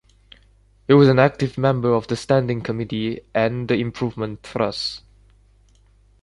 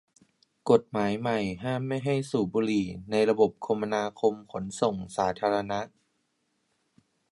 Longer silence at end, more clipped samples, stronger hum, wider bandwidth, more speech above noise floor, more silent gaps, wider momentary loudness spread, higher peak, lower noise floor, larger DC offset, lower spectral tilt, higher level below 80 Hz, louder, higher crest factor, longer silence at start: second, 1.25 s vs 1.45 s; neither; first, 50 Hz at -50 dBFS vs none; about the same, 11.5 kHz vs 11.5 kHz; second, 35 dB vs 48 dB; neither; first, 13 LU vs 8 LU; first, -2 dBFS vs -8 dBFS; second, -55 dBFS vs -75 dBFS; neither; about the same, -7 dB/octave vs -6 dB/octave; first, -50 dBFS vs -62 dBFS; first, -20 LUFS vs -28 LUFS; about the same, 20 dB vs 22 dB; first, 0.9 s vs 0.65 s